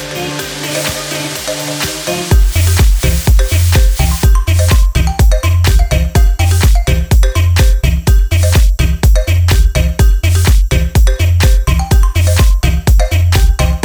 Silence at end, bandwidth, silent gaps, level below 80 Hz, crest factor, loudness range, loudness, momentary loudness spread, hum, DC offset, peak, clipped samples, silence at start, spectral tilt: 0 s; over 20 kHz; none; -10 dBFS; 8 dB; 1 LU; -12 LUFS; 6 LU; none; under 0.1%; 0 dBFS; under 0.1%; 0 s; -4.5 dB/octave